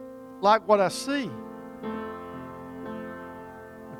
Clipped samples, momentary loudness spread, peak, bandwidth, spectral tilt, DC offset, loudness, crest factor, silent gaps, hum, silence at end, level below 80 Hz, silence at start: under 0.1%; 20 LU; -6 dBFS; 18.5 kHz; -4.5 dB/octave; under 0.1%; -27 LUFS; 22 dB; none; none; 0 s; -64 dBFS; 0 s